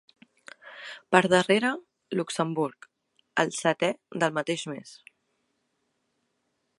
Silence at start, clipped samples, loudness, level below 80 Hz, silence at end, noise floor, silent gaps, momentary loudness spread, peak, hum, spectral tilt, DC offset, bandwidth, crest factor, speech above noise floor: 0.65 s; under 0.1%; -26 LUFS; -76 dBFS; 1.85 s; -76 dBFS; none; 20 LU; -2 dBFS; none; -4.5 dB/octave; under 0.1%; 11.5 kHz; 28 dB; 50 dB